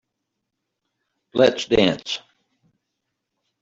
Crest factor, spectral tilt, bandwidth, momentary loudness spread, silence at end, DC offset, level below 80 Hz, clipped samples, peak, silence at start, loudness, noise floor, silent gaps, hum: 22 dB; -4.5 dB/octave; 7.8 kHz; 12 LU; 1.45 s; under 0.1%; -54 dBFS; under 0.1%; -2 dBFS; 1.35 s; -20 LUFS; -80 dBFS; none; none